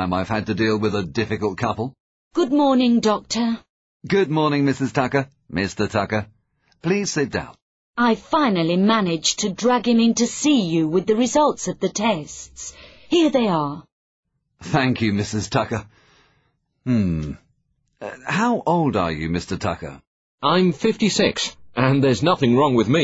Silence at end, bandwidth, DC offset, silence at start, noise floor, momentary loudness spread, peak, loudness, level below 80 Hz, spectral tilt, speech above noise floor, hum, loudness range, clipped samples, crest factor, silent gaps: 0 s; 8 kHz; under 0.1%; 0 s; -68 dBFS; 13 LU; -4 dBFS; -20 LUFS; -50 dBFS; -5 dB/octave; 48 dB; none; 5 LU; under 0.1%; 18 dB; 2.00-2.31 s, 3.69-4.00 s, 7.62-7.93 s, 13.92-14.23 s, 20.07-20.38 s